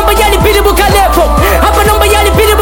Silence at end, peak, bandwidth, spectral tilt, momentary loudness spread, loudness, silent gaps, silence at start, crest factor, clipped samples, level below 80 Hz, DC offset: 0 s; 0 dBFS; 18 kHz; -4 dB/octave; 1 LU; -7 LUFS; none; 0 s; 6 dB; 0.2%; -12 dBFS; under 0.1%